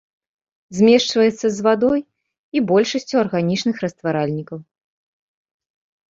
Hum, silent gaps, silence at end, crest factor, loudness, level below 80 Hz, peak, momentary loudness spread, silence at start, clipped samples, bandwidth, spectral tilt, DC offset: none; 2.38-2.52 s; 1.5 s; 18 dB; -18 LUFS; -60 dBFS; -2 dBFS; 11 LU; 0.7 s; under 0.1%; 8 kHz; -5.5 dB/octave; under 0.1%